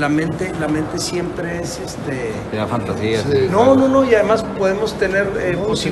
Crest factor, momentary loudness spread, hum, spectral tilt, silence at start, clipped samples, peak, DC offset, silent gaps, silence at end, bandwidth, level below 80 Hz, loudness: 18 dB; 11 LU; none; -5.5 dB/octave; 0 s; under 0.1%; 0 dBFS; under 0.1%; none; 0 s; 12.5 kHz; -40 dBFS; -18 LUFS